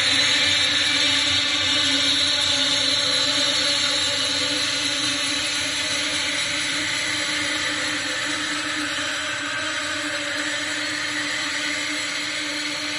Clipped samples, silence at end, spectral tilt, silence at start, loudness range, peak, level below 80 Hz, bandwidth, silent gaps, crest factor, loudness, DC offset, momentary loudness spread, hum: under 0.1%; 0 s; -0.5 dB/octave; 0 s; 6 LU; -8 dBFS; -58 dBFS; 11.5 kHz; none; 16 dB; -20 LUFS; under 0.1%; 7 LU; none